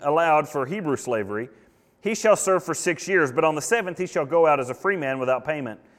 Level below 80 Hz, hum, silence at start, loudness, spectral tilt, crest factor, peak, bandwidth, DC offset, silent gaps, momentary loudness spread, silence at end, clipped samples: -66 dBFS; none; 0 s; -23 LUFS; -4.5 dB/octave; 18 dB; -6 dBFS; 16 kHz; under 0.1%; none; 10 LU; 0.25 s; under 0.1%